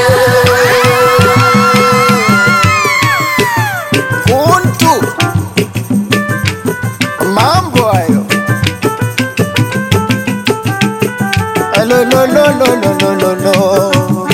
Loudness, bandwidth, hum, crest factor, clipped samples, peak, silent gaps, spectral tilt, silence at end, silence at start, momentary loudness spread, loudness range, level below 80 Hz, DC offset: -10 LUFS; 17 kHz; none; 10 dB; under 0.1%; 0 dBFS; none; -5 dB/octave; 0 s; 0 s; 7 LU; 5 LU; -40 dBFS; under 0.1%